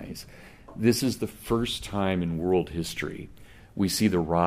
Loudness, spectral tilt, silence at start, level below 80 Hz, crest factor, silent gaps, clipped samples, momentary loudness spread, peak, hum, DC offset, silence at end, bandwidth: -27 LUFS; -5 dB/octave; 0 s; -48 dBFS; 20 dB; none; under 0.1%; 18 LU; -8 dBFS; none; under 0.1%; 0 s; 15.5 kHz